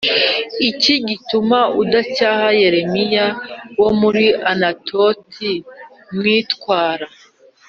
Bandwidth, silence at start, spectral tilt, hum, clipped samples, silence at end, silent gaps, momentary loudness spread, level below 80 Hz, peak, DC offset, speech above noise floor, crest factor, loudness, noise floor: 7.2 kHz; 0 s; -2 dB/octave; none; under 0.1%; 0.6 s; none; 9 LU; -56 dBFS; -2 dBFS; under 0.1%; 32 dB; 16 dB; -16 LUFS; -48 dBFS